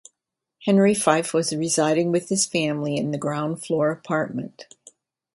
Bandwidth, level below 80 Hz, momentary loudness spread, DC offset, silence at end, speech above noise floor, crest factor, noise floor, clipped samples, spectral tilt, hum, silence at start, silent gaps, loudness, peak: 11.5 kHz; -66 dBFS; 9 LU; under 0.1%; 0.7 s; 61 dB; 20 dB; -83 dBFS; under 0.1%; -4.5 dB/octave; none; 0.6 s; none; -22 LUFS; -2 dBFS